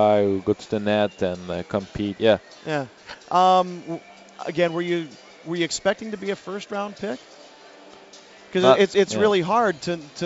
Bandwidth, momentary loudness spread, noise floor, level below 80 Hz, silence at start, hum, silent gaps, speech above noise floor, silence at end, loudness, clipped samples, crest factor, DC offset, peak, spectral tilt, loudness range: 8 kHz; 15 LU; -47 dBFS; -58 dBFS; 0 s; none; none; 25 dB; 0 s; -23 LUFS; under 0.1%; 22 dB; under 0.1%; 0 dBFS; -5 dB/octave; 6 LU